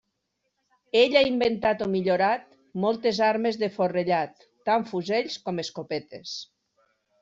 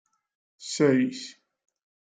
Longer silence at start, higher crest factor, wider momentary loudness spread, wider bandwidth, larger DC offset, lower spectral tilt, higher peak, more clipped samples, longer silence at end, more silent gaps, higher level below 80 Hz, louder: first, 0.95 s vs 0.6 s; about the same, 18 dB vs 20 dB; second, 14 LU vs 20 LU; second, 7.8 kHz vs 9.4 kHz; neither; about the same, -5 dB/octave vs -5 dB/octave; about the same, -8 dBFS vs -10 dBFS; neither; about the same, 0.75 s vs 0.85 s; neither; first, -64 dBFS vs -78 dBFS; about the same, -25 LUFS vs -25 LUFS